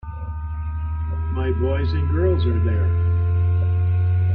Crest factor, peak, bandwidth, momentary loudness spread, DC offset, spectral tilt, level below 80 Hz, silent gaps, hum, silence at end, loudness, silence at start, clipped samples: 10 dB; -8 dBFS; 4.4 kHz; 9 LU; under 0.1%; -11.5 dB/octave; -30 dBFS; none; none; 0 s; -22 LUFS; 0.05 s; under 0.1%